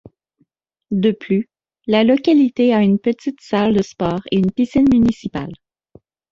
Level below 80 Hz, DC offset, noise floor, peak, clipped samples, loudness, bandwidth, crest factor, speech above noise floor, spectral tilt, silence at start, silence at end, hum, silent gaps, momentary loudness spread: -46 dBFS; under 0.1%; -64 dBFS; -2 dBFS; under 0.1%; -17 LUFS; 7.6 kHz; 16 dB; 48 dB; -7.5 dB/octave; 0.9 s; 0.8 s; none; none; 12 LU